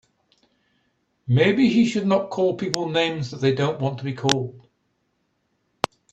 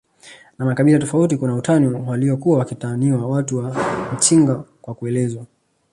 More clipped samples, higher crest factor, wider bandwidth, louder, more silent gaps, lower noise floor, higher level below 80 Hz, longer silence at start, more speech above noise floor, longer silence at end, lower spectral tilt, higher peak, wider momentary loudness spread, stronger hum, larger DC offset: neither; first, 24 dB vs 18 dB; about the same, 11.5 kHz vs 11.5 kHz; second, -22 LUFS vs -18 LUFS; neither; first, -71 dBFS vs -45 dBFS; about the same, -58 dBFS vs -56 dBFS; first, 1.25 s vs 0.25 s; first, 50 dB vs 28 dB; first, 1.55 s vs 0.45 s; about the same, -5.5 dB/octave vs -6 dB/octave; about the same, 0 dBFS vs -2 dBFS; about the same, 12 LU vs 10 LU; neither; neither